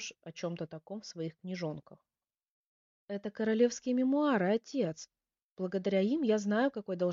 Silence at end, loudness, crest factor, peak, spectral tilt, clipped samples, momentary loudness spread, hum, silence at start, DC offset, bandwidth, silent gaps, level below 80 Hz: 0 s; -33 LUFS; 18 dB; -16 dBFS; -5.5 dB/octave; under 0.1%; 14 LU; none; 0 s; under 0.1%; 7.4 kHz; 2.50-3.08 s, 5.43-5.55 s; -78 dBFS